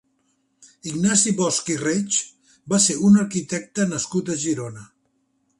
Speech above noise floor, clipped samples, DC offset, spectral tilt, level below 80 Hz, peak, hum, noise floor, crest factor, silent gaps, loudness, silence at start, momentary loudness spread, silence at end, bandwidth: 48 dB; under 0.1%; under 0.1%; -4 dB/octave; -62 dBFS; -4 dBFS; none; -68 dBFS; 20 dB; none; -21 LUFS; 0.85 s; 12 LU; 0.75 s; 11.5 kHz